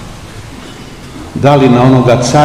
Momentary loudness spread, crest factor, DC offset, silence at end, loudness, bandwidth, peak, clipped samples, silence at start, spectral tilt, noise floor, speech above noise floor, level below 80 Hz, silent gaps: 22 LU; 10 dB; 0.8%; 0 s; -8 LUFS; 12.5 kHz; 0 dBFS; 3%; 0 s; -6.5 dB/octave; -28 dBFS; 22 dB; -34 dBFS; none